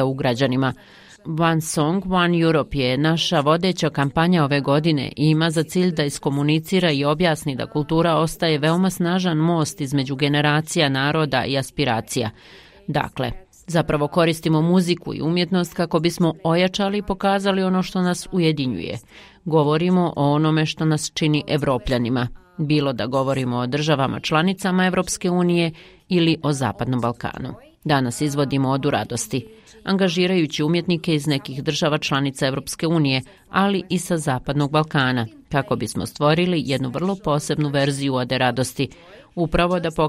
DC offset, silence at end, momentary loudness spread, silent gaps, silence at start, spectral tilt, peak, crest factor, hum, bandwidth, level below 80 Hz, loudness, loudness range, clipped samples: under 0.1%; 0 s; 7 LU; none; 0 s; -5.5 dB/octave; -4 dBFS; 18 dB; none; 15.5 kHz; -46 dBFS; -21 LUFS; 3 LU; under 0.1%